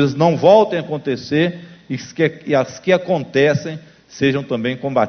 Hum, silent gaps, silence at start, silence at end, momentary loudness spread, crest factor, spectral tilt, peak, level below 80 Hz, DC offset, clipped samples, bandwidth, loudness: none; none; 0 s; 0 s; 16 LU; 16 dB; -6.5 dB/octave; 0 dBFS; -56 dBFS; under 0.1%; under 0.1%; 6.6 kHz; -17 LUFS